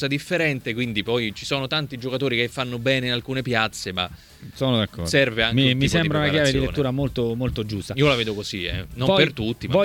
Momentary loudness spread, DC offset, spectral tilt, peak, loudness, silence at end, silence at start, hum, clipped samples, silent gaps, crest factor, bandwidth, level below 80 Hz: 8 LU; under 0.1%; -5 dB/octave; -4 dBFS; -22 LUFS; 0 s; 0 s; none; under 0.1%; none; 18 dB; 17 kHz; -42 dBFS